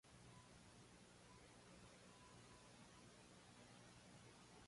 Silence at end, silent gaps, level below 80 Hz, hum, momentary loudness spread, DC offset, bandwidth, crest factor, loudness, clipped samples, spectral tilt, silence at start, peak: 0 s; none; -78 dBFS; 60 Hz at -70 dBFS; 1 LU; under 0.1%; 11.5 kHz; 14 dB; -65 LUFS; under 0.1%; -4 dB/octave; 0.05 s; -52 dBFS